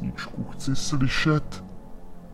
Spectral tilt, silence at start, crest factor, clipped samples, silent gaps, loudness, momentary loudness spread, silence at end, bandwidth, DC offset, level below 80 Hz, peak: -5 dB/octave; 0 s; 16 dB; under 0.1%; none; -26 LUFS; 23 LU; 0 s; 13 kHz; under 0.1%; -38 dBFS; -10 dBFS